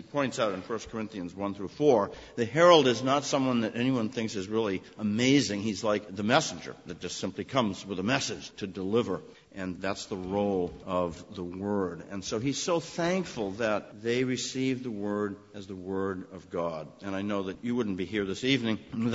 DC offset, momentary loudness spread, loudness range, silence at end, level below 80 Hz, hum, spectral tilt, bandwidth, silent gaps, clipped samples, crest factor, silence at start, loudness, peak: under 0.1%; 13 LU; 7 LU; 0 s; -62 dBFS; none; -4.5 dB/octave; 8 kHz; none; under 0.1%; 24 dB; 0 s; -29 LUFS; -6 dBFS